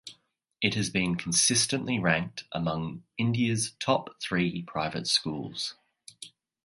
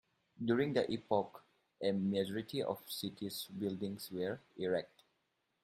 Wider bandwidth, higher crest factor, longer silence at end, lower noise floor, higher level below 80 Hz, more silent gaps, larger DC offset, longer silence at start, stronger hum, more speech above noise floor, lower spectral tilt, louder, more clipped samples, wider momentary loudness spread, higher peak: second, 11.5 kHz vs 16 kHz; about the same, 22 dB vs 20 dB; second, 0.35 s vs 0.75 s; second, -67 dBFS vs -82 dBFS; first, -58 dBFS vs -78 dBFS; neither; neither; second, 0.05 s vs 0.4 s; neither; second, 39 dB vs 45 dB; second, -3.5 dB/octave vs -5.5 dB/octave; first, -28 LUFS vs -38 LUFS; neither; first, 13 LU vs 8 LU; first, -6 dBFS vs -18 dBFS